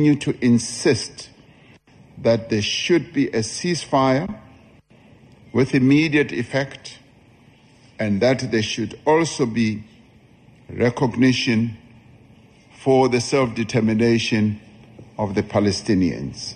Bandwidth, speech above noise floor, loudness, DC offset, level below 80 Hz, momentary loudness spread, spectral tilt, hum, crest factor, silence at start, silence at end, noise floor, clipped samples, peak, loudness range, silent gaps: 10 kHz; 32 dB; -20 LUFS; under 0.1%; -52 dBFS; 12 LU; -5.5 dB/octave; none; 16 dB; 0 s; 0 s; -51 dBFS; under 0.1%; -4 dBFS; 2 LU; none